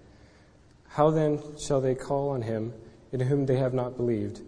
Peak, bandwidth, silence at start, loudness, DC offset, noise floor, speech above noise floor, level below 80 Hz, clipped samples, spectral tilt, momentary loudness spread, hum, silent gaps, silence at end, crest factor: -8 dBFS; 10.5 kHz; 0.9 s; -28 LUFS; under 0.1%; -57 dBFS; 30 dB; -54 dBFS; under 0.1%; -7.5 dB/octave; 12 LU; none; none; 0 s; 20 dB